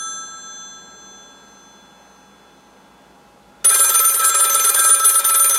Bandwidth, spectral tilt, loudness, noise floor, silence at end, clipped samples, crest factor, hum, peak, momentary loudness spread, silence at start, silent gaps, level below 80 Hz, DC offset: 16.5 kHz; 3.5 dB/octave; -11 LUFS; -49 dBFS; 0 s; under 0.1%; 16 dB; none; -2 dBFS; 22 LU; 0 s; none; -68 dBFS; under 0.1%